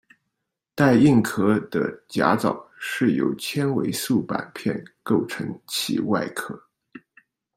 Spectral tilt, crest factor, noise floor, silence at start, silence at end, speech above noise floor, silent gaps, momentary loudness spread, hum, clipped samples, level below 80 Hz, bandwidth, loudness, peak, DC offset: -5.5 dB/octave; 22 dB; -81 dBFS; 0.75 s; 0.6 s; 59 dB; none; 14 LU; none; under 0.1%; -60 dBFS; 16 kHz; -23 LUFS; -2 dBFS; under 0.1%